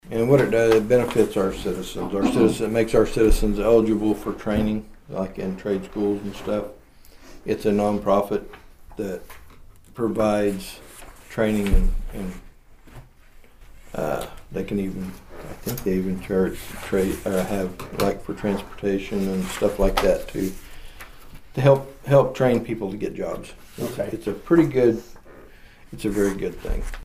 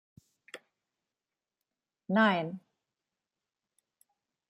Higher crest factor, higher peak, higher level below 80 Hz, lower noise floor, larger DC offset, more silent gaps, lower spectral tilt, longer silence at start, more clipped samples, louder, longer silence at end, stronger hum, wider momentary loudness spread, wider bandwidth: about the same, 18 dB vs 22 dB; first, -4 dBFS vs -14 dBFS; first, -32 dBFS vs -86 dBFS; second, -48 dBFS vs under -90 dBFS; neither; neither; about the same, -6.5 dB/octave vs -6.5 dB/octave; second, 0.05 s vs 0.55 s; neither; first, -23 LUFS vs -29 LUFS; second, 0 s vs 1.9 s; neither; second, 16 LU vs 24 LU; first, 15.5 kHz vs 11.5 kHz